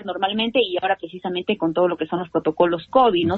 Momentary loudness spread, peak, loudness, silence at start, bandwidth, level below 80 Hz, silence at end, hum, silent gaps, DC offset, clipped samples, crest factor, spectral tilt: 8 LU; -4 dBFS; -21 LUFS; 0 s; 4.4 kHz; -58 dBFS; 0 s; none; none; under 0.1%; under 0.1%; 16 dB; -8 dB/octave